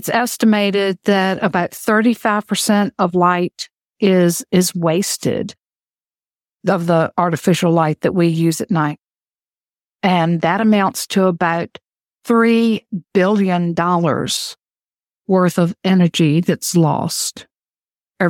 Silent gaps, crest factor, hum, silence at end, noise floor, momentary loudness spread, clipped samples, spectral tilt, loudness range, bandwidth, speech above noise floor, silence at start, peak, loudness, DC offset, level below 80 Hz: none; 16 dB; none; 0 s; under -90 dBFS; 7 LU; under 0.1%; -5.5 dB/octave; 2 LU; 17.5 kHz; over 74 dB; 0 s; -2 dBFS; -16 LUFS; under 0.1%; -60 dBFS